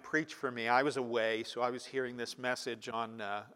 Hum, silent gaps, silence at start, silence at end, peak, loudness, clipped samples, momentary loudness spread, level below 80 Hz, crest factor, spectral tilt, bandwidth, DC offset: none; none; 0 s; 0 s; -14 dBFS; -35 LUFS; under 0.1%; 8 LU; -84 dBFS; 20 dB; -4 dB/octave; 16 kHz; under 0.1%